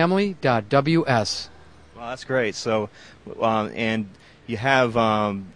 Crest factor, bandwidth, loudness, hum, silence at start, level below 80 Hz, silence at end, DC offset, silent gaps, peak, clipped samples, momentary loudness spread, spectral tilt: 20 dB; 10.5 kHz; -22 LUFS; none; 0 s; -54 dBFS; 0.05 s; 0.2%; none; -4 dBFS; under 0.1%; 15 LU; -5.5 dB/octave